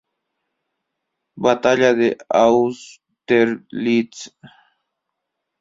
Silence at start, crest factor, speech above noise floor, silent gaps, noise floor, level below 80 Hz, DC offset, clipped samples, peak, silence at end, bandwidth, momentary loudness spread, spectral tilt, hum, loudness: 1.35 s; 18 dB; 61 dB; none; -79 dBFS; -60 dBFS; under 0.1%; under 0.1%; -2 dBFS; 1.35 s; 7.8 kHz; 16 LU; -5 dB/octave; none; -17 LUFS